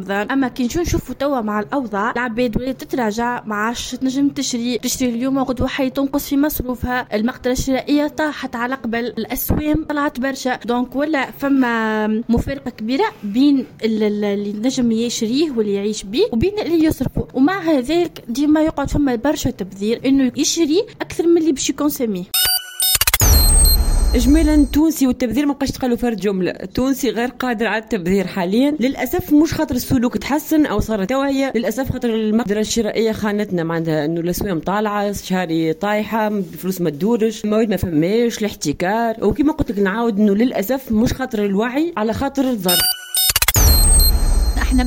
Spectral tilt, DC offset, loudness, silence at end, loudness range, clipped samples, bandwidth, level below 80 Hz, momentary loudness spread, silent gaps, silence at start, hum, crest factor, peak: -4 dB/octave; under 0.1%; -18 LUFS; 0 s; 5 LU; under 0.1%; 17 kHz; -26 dBFS; 7 LU; none; 0 s; none; 18 dB; 0 dBFS